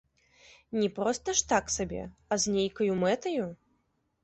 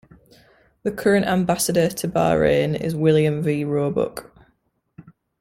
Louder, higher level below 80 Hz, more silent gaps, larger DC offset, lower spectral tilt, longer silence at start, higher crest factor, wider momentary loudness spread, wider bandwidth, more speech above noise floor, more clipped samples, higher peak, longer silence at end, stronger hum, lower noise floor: second, -30 LUFS vs -20 LUFS; second, -56 dBFS vs -50 dBFS; neither; neither; second, -3.5 dB/octave vs -5.5 dB/octave; second, 0.7 s vs 0.85 s; about the same, 20 dB vs 18 dB; about the same, 9 LU vs 9 LU; second, 8.6 kHz vs 16.5 kHz; about the same, 45 dB vs 47 dB; neither; second, -10 dBFS vs -4 dBFS; first, 0.7 s vs 0.3 s; neither; first, -75 dBFS vs -67 dBFS